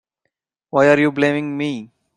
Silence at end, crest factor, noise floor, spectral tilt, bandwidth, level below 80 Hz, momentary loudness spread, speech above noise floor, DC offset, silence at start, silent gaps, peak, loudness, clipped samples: 0.3 s; 18 dB; -76 dBFS; -6.5 dB/octave; 10.5 kHz; -62 dBFS; 11 LU; 59 dB; under 0.1%; 0.75 s; none; -2 dBFS; -17 LUFS; under 0.1%